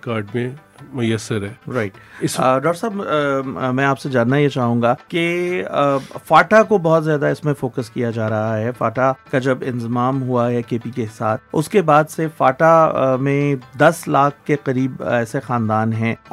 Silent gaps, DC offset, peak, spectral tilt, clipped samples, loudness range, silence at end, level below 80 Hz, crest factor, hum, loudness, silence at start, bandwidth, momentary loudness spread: none; under 0.1%; 0 dBFS; -6.5 dB/octave; under 0.1%; 4 LU; 0.15 s; -58 dBFS; 18 dB; none; -18 LUFS; 0.05 s; 15.5 kHz; 10 LU